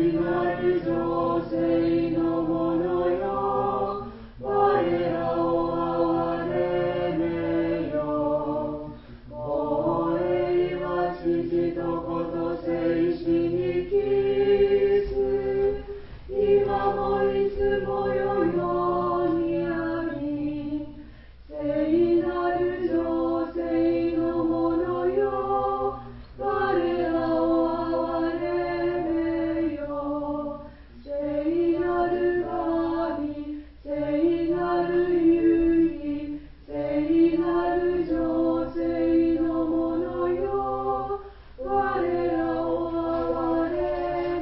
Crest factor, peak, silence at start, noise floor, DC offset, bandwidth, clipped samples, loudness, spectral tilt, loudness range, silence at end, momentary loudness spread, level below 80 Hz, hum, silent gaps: 16 dB; -10 dBFS; 0 s; -45 dBFS; under 0.1%; 5.6 kHz; under 0.1%; -25 LUFS; -11.5 dB/octave; 3 LU; 0 s; 9 LU; -46 dBFS; none; none